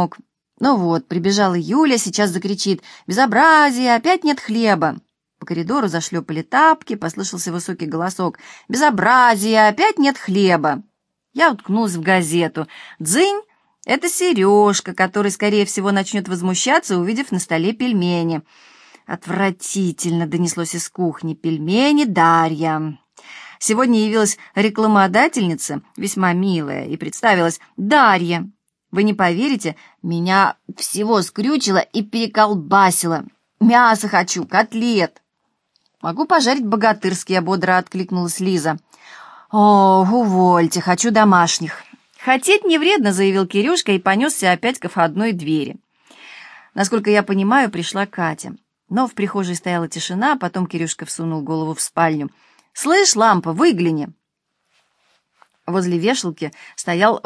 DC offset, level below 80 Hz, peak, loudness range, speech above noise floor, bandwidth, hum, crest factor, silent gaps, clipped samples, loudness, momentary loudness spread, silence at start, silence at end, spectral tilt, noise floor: under 0.1%; -68 dBFS; 0 dBFS; 5 LU; 57 dB; 11 kHz; none; 18 dB; none; under 0.1%; -17 LUFS; 12 LU; 0 s; 0.05 s; -4.5 dB/octave; -74 dBFS